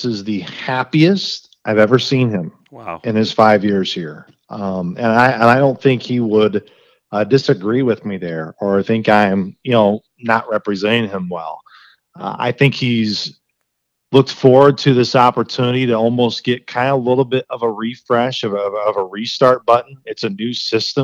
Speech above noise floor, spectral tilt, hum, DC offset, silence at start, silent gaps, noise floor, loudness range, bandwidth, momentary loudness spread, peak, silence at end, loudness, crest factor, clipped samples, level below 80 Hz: 57 dB; -6.5 dB/octave; none; under 0.1%; 0 s; none; -73 dBFS; 4 LU; 9.4 kHz; 13 LU; 0 dBFS; 0 s; -16 LUFS; 16 dB; under 0.1%; -62 dBFS